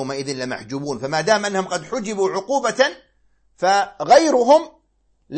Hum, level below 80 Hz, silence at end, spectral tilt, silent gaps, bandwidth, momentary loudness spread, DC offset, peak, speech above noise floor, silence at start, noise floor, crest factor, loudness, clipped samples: none; -60 dBFS; 0 s; -3.5 dB/octave; none; 8.8 kHz; 13 LU; under 0.1%; -2 dBFS; 45 dB; 0 s; -63 dBFS; 18 dB; -19 LUFS; under 0.1%